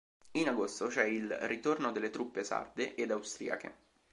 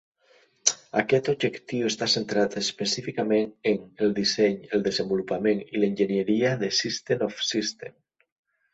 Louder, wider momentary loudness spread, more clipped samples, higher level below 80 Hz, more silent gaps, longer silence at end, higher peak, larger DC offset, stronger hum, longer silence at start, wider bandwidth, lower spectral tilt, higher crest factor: second, -36 LUFS vs -25 LUFS; first, 7 LU vs 4 LU; neither; second, -76 dBFS vs -66 dBFS; neither; second, 0.4 s vs 0.85 s; second, -14 dBFS vs -2 dBFS; neither; neither; second, 0.25 s vs 0.65 s; first, 11.5 kHz vs 8.2 kHz; about the same, -3.5 dB/octave vs -3.5 dB/octave; about the same, 22 dB vs 24 dB